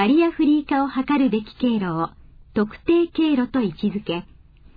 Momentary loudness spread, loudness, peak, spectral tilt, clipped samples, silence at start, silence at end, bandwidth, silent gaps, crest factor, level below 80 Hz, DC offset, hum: 9 LU; -22 LUFS; -8 dBFS; -9.5 dB/octave; under 0.1%; 0 s; 0.55 s; 5 kHz; none; 14 dB; -48 dBFS; under 0.1%; none